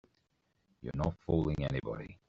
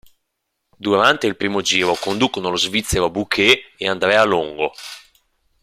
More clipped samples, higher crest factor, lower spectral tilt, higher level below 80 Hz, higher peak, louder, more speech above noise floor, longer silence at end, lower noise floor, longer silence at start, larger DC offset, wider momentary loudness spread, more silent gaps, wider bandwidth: neither; about the same, 20 dB vs 18 dB; first, -7.5 dB/octave vs -3 dB/octave; second, -50 dBFS vs -44 dBFS; second, -16 dBFS vs 0 dBFS; second, -35 LUFS vs -17 LUFS; second, 43 dB vs 57 dB; second, 0.15 s vs 0.65 s; about the same, -78 dBFS vs -75 dBFS; about the same, 0.8 s vs 0.8 s; neither; about the same, 10 LU vs 10 LU; neither; second, 7.4 kHz vs 15.5 kHz